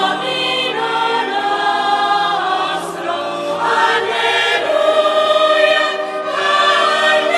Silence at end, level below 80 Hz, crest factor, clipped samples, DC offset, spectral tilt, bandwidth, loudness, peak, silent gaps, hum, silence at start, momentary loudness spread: 0 s; -66 dBFS; 14 dB; under 0.1%; under 0.1%; -2 dB/octave; 13 kHz; -15 LUFS; 0 dBFS; none; none; 0 s; 8 LU